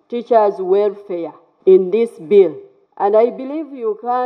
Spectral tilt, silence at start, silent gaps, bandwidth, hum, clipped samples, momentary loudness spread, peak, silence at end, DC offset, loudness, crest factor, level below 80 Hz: -8.5 dB/octave; 0.1 s; none; 4.9 kHz; none; under 0.1%; 13 LU; -2 dBFS; 0 s; under 0.1%; -16 LUFS; 14 dB; -80 dBFS